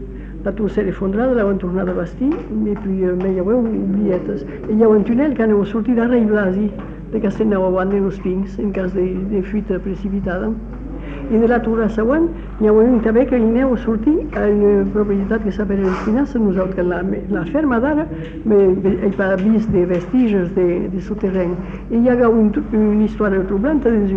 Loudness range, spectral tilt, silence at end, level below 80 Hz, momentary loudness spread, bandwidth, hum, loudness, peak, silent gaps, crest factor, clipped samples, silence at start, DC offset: 4 LU; -9.5 dB/octave; 0 s; -32 dBFS; 8 LU; 6.2 kHz; none; -17 LUFS; -4 dBFS; none; 12 dB; under 0.1%; 0 s; under 0.1%